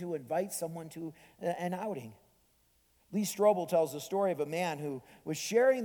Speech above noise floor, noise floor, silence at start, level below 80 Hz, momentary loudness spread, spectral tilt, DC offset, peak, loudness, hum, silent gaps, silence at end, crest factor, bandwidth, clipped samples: 38 dB; -70 dBFS; 0 s; -76 dBFS; 15 LU; -4.5 dB/octave; under 0.1%; -14 dBFS; -33 LUFS; none; none; 0 s; 18 dB; 19 kHz; under 0.1%